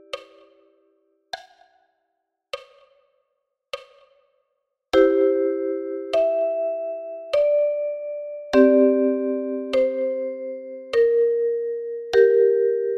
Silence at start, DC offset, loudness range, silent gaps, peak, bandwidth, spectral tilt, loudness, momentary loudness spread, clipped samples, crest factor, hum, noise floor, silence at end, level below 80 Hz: 0.15 s; under 0.1%; 22 LU; none; -4 dBFS; 8.6 kHz; -5 dB/octave; -21 LUFS; 20 LU; under 0.1%; 18 dB; none; -77 dBFS; 0 s; -60 dBFS